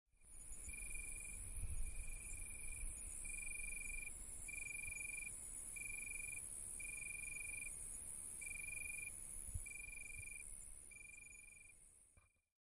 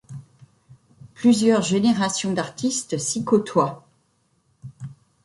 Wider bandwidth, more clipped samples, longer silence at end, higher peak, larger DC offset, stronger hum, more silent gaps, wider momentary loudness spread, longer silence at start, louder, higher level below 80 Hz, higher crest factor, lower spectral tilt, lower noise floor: about the same, 11.5 kHz vs 11.5 kHz; neither; first, 0.5 s vs 0.3 s; second, -32 dBFS vs -6 dBFS; neither; neither; neither; second, 10 LU vs 22 LU; about the same, 0.15 s vs 0.1 s; second, -48 LUFS vs -21 LUFS; first, -56 dBFS vs -62 dBFS; about the same, 16 dB vs 18 dB; second, -1.5 dB/octave vs -4.5 dB/octave; first, -73 dBFS vs -66 dBFS